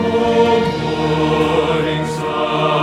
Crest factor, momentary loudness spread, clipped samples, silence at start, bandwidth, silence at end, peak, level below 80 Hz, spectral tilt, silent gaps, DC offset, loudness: 14 dB; 6 LU; under 0.1%; 0 s; 12.5 kHz; 0 s; -2 dBFS; -40 dBFS; -6 dB/octave; none; under 0.1%; -16 LUFS